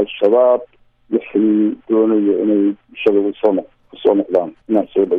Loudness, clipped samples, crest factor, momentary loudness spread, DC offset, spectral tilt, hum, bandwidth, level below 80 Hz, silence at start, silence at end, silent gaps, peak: -16 LUFS; under 0.1%; 14 dB; 6 LU; under 0.1%; -9 dB/octave; none; 3.8 kHz; -60 dBFS; 0 s; 0 s; none; -2 dBFS